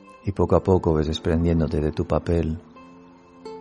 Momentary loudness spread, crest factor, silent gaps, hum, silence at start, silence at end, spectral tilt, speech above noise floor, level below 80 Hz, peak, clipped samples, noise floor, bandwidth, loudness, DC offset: 13 LU; 20 dB; none; none; 0.1 s; 0 s; -8 dB/octave; 27 dB; -36 dBFS; -2 dBFS; under 0.1%; -48 dBFS; 10 kHz; -23 LUFS; under 0.1%